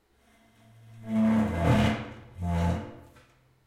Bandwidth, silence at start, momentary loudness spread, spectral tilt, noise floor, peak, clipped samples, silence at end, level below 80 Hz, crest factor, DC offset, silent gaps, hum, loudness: 13 kHz; 0.9 s; 18 LU; -7.5 dB/octave; -63 dBFS; -10 dBFS; under 0.1%; 0.65 s; -48 dBFS; 18 dB; under 0.1%; none; none; -27 LUFS